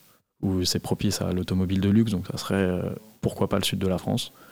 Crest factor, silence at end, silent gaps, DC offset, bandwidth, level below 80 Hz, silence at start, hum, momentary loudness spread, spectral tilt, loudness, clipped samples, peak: 16 dB; 0 s; none; 0.2%; 17 kHz; -54 dBFS; 0.4 s; none; 8 LU; -5.5 dB/octave; -26 LUFS; under 0.1%; -10 dBFS